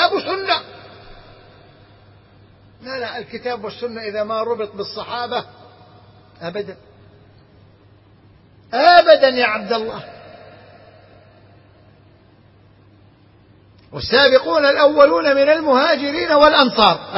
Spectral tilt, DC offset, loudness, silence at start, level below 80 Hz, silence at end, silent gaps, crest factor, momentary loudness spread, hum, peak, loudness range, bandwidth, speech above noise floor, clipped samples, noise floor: -6 dB/octave; under 0.1%; -16 LUFS; 0 s; -52 dBFS; 0 s; none; 18 dB; 18 LU; none; 0 dBFS; 17 LU; 6 kHz; 34 dB; under 0.1%; -50 dBFS